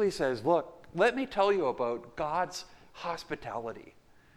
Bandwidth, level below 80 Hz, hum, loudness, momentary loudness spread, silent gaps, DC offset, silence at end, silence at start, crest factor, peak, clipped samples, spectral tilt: 14 kHz; -60 dBFS; none; -31 LUFS; 14 LU; none; under 0.1%; 0.45 s; 0 s; 18 dB; -14 dBFS; under 0.1%; -5 dB/octave